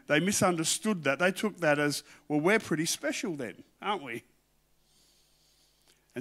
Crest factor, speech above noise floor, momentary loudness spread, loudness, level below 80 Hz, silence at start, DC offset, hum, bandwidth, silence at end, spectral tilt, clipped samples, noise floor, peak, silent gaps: 20 dB; 40 dB; 12 LU; -29 LUFS; -72 dBFS; 0.1 s; under 0.1%; none; 16 kHz; 0 s; -3.5 dB/octave; under 0.1%; -69 dBFS; -10 dBFS; none